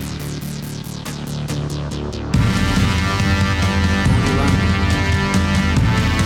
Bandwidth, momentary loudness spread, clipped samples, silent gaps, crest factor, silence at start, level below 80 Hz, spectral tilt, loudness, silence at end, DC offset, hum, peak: 16.5 kHz; 11 LU; under 0.1%; none; 14 dB; 0 s; -26 dBFS; -5.5 dB/octave; -18 LUFS; 0 s; under 0.1%; none; -4 dBFS